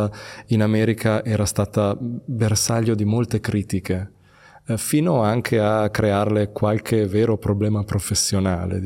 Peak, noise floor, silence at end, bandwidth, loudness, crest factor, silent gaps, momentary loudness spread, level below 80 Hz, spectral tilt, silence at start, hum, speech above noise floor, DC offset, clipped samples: -4 dBFS; -50 dBFS; 0 s; 17 kHz; -21 LUFS; 16 dB; none; 8 LU; -50 dBFS; -5.5 dB/octave; 0 s; none; 30 dB; under 0.1%; under 0.1%